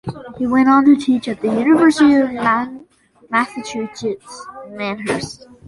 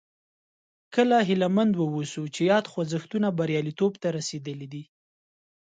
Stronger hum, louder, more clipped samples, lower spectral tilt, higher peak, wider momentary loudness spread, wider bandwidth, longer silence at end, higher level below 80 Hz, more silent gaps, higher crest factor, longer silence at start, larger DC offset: neither; first, -16 LUFS vs -26 LUFS; neither; about the same, -5.5 dB/octave vs -6 dB/octave; first, -2 dBFS vs -8 dBFS; first, 18 LU vs 14 LU; first, 11.5 kHz vs 9.2 kHz; second, 0.3 s vs 0.85 s; first, -54 dBFS vs -70 dBFS; neither; second, 14 dB vs 20 dB; second, 0.05 s vs 0.9 s; neither